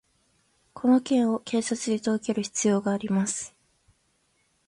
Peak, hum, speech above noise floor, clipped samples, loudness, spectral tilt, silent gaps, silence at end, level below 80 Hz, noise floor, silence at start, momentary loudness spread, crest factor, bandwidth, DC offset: -10 dBFS; none; 45 dB; under 0.1%; -26 LUFS; -5 dB/octave; none; 1.2 s; -68 dBFS; -70 dBFS; 0.75 s; 6 LU; 18 dB; 11.5 kHz; under 0.1%